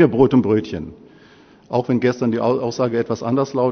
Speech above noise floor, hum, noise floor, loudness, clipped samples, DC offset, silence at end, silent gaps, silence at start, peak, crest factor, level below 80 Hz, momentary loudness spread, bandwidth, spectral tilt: 30 dB; none; -48 dBFS; -19 LUFS; under 0.1%; under 0.1%; 0 s; none; 0 s; 0 dBFS; 18 dB; -50 dBFS; 10 LU; 6.6 kHz; -7.5 dB/octave